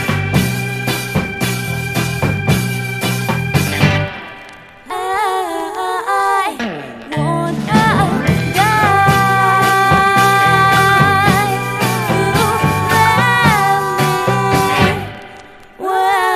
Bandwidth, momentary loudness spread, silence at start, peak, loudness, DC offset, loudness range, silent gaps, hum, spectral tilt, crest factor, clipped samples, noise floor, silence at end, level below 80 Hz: 15.5 kHz; 10 LU; 0 s; 0 dBFS; -14 LUFS; under 0.1%; 7 LU; none; none; -5 dB/octave; 14 dB; under 0.1%; -37 dBFS; 0 s; -38 dBFS